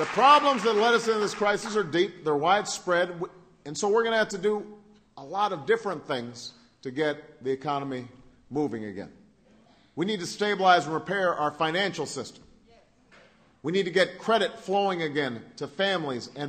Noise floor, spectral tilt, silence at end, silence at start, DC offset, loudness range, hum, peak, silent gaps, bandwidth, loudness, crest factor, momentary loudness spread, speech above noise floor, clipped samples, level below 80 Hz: -59 dBFS; -4 dB/octave; 0 s; 0 s; under 0.1%; 7 LU; none; -6 dBFS; none; 13.5 kHz; -26 LUFS; 22 dB; 16 LU; 33 dB; under 0.1%; -68 dBFS